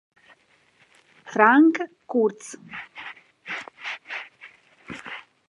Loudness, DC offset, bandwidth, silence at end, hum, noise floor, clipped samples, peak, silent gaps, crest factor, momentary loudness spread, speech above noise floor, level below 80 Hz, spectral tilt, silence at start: -22 LUFS; under 0.1%; 11 kHz; 0.3 s; none; -61 dBFS; under 0.1%; -2 dBFS; none; 24 dB; 23 LU; 40 dB; -74 dBFS; -4.5 dB/octave; 1.25 s